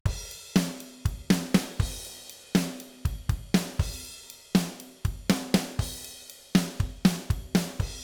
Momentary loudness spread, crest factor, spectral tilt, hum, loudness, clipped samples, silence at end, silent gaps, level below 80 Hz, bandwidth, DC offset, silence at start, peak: 13 LU; 22 dB; -5 dB/octave; none; -29 LUFS; under 0.1%; 0 s; none; -38 dBFS; over 20 kHz; under 0.1%; 0.05 s; -6 dBFS